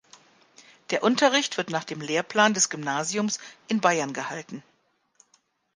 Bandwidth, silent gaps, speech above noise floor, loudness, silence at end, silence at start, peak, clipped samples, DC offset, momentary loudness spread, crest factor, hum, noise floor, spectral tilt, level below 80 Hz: 10.5 kHz; none; 42 dB; -25 LUFS; 1.15 s; 0.9 s; -6 dBFS; under 0.1%; under 0.1%; 13 LU; 22 dB; none; -67 dBFS; -2.5 dB/octave; -76 dBFS